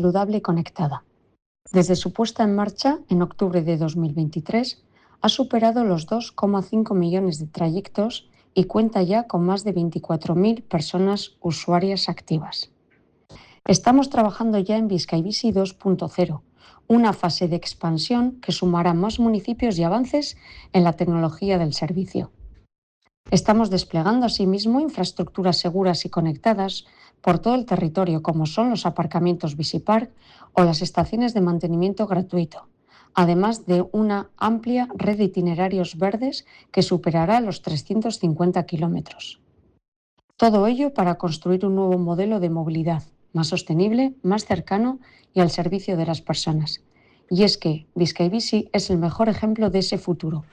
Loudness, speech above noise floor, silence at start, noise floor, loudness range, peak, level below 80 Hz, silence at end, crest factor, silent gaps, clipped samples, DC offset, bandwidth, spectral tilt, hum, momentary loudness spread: -22 LUFS; 40 dB; 0 s; -61 dBFS; 2 LU; -6 dBFS; -50 dBFS; 0.1 s; 16 dB; 1.46-1.55 s, 22.78-23.01 s, 23.17-23.24 s, 39.88-40.17 s, 40.24-40.28 s; under 0.1%; under 0.1%; 9.6 kHz; -6.5 dB/octave; none; 7 LU